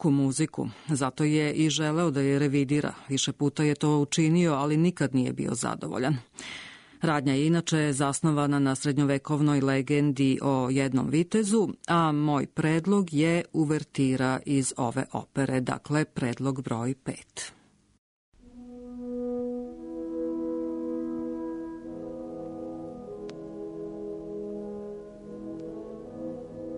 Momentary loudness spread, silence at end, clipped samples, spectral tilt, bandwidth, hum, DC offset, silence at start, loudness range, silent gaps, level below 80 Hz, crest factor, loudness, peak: 15 LU; 0 s; under 0.1%; -5.5 dB/octave; 11 kHz; none; under 0.1%; 0 s; 13 LU; 17.98-18.32 s; -60 dBFS; 14 dB; -27 LUFS; -14 dBFS